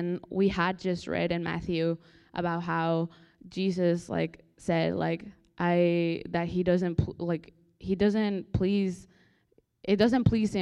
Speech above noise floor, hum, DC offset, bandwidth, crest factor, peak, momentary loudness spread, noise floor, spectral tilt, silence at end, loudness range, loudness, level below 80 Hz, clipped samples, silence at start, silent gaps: 40 dB; none; under 0.1%; 10.5 kHz; 18 dB; -10 dBFS; 11 LU; -68 dBFS; -7.5 dB/octave; 0 s; 2 LU; -29 LUFS; -52 dBFS; under 0.1%; 0 s; none